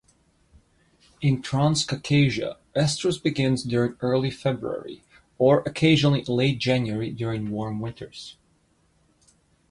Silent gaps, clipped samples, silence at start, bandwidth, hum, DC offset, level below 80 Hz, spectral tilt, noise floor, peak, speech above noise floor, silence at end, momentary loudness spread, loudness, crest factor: none; under 0.1%; 1.2 s; 11.5 kHz; none; under 0.1%; -54 dBFS; -6 dB/octave; -64 dBFS; -6 dBFS; 41 dB; 1.4 s; 12 LU; -24 LUFS; 18 dB